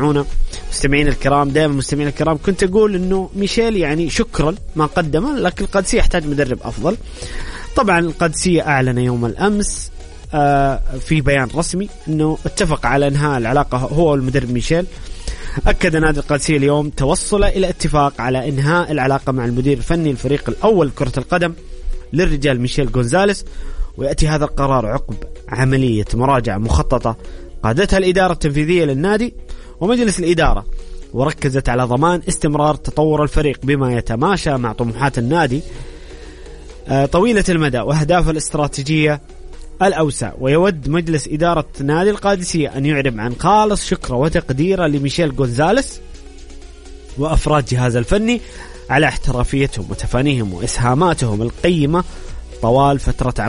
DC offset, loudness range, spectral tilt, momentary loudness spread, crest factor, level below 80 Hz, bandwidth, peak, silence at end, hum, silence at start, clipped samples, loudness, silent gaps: under 0.1%; 2 LU; -5.5 dB/octave; 10 LU; 14 dB; -26 dBFS; 11 kHz; -2 dBFS; 0 s; none; 0 s; under 0.1%; -17 LUFS; none